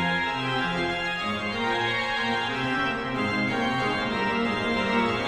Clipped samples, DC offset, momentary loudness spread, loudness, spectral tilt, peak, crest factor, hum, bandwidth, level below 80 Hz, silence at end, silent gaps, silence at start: under 0.1%; under 0.1%; 3 LU; -26 LUFS; -5 dB/octave; -12 dBFS; 14 dB; none; 13.5 kHz; -50 dBFS; 0 s; none; 0 s